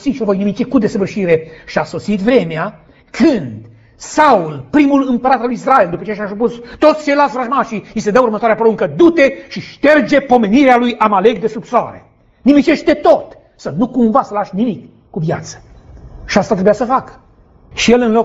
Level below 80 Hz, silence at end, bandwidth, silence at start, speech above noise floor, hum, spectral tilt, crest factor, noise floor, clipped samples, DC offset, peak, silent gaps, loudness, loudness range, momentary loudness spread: -44 dBFS; 0 s; 8 kHz; 0 s; 32 dB; none; -6 dB/octave; 14 dB; -45 dBFS; under 0.1%; under 0.1%; 0 dBFS; none; -13 LUFS; 5 LU; 11 LU